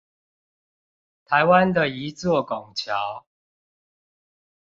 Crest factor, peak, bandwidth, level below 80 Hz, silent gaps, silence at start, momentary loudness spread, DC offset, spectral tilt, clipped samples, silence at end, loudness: 22 dB; -4 dBFS; 7.8 kHz; -60 dBFS; none; 1.3 s; 12 LU; under 0.1%; -5.5 dB/octave; under 0.1%; 1.5 s; -22 LUFS